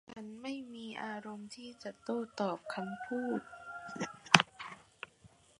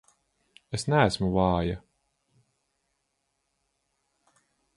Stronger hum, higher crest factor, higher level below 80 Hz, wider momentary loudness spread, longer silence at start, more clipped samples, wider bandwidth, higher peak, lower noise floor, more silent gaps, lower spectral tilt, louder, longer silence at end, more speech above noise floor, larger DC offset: neither; first, 36 dB vs 22 dB; second, -76 dBFS vs -48 dBFS; first, 22 LU vs 12 LU; second, 0.1 s vs 0.7 s; neither; about the same, 11.5 kHz vs 11.5 kHz; first, 0 dBFS vs -8 dBFS; second, -64 dBFS vs -78 dBFS; neither; second, -3 dB/octave vs -6 dB/octave; second, -35 LUFS vs -26 LUFS; second, 0.35 s vs 3 s; second, 23 dB vs 53 dB; neither